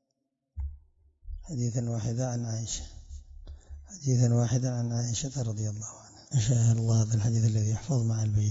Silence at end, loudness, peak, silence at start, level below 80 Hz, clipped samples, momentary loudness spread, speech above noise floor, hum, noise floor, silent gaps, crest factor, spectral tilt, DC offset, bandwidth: 0 s; -29 LUFS; -12 dBFS; 0.55 s; -48 dBFS; under 0.1%; 23 LU; 54 dB; none; -81 dBFS; none; 16 dB; -6 dB/octave; under 0.1%; 7.8 kHz